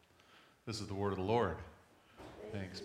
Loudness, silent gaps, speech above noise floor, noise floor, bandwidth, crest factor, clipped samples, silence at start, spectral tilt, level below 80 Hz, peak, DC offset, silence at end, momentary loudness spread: -39 LUFS; none; 27 dB; -65 dBFS; 15 kHz; 22 dB; under 0.1%; 0.3 s; -6 dB/octave; -66 dBFS; -20 dBFS; under 0.1%; 0 s; 21 LU